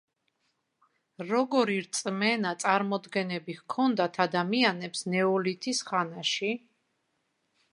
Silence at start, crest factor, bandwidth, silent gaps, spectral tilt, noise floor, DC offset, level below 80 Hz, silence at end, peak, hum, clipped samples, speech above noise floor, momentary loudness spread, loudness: 1.2 s; 22 dB; 11 kHz; none; -4 dB/octave; -77 dBFS; under 0.1%; -82 dBFS; 1.15 s; -8 dBFS; none; under 0.1%; 49 dB; 8 LU; -28 LUFS